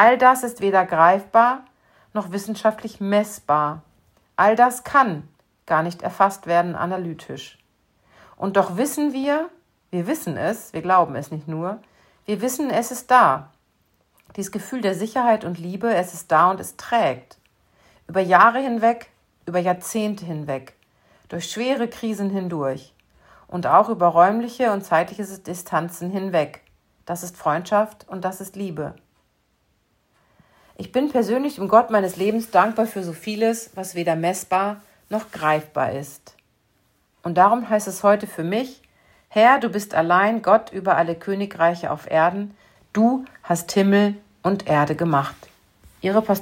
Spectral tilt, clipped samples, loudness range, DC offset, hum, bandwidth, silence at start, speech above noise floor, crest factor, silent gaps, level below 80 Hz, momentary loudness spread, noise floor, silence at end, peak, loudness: -5.5 dB/octave; under 0.1%; 6 LU; under 0.1%; none; 16.5 kHz; 0 s; 46 dB; 20 dB; none; -64 dBFS; 15 LU; -66 dBFS; 0 s; 0 dBFS; -21 LUFS